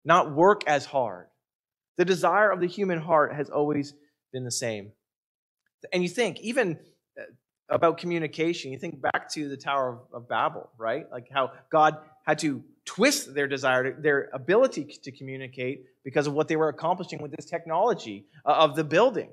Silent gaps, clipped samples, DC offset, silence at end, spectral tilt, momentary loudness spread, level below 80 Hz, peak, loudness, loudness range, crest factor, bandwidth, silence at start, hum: 1.55-1.64 s, 1.88-1.95 s, 5.16-5.57 s, 5.74-5.79 s, 7.59-7.63 s; under 0.1%; under 0.1%; 0.05 s; -4.5 dB/octave; 16 LU; -76 dBFS; -6 dBFS; -26 LUFS; 5 LU; 22 dB; 14.5 kHz; 0.05 s; none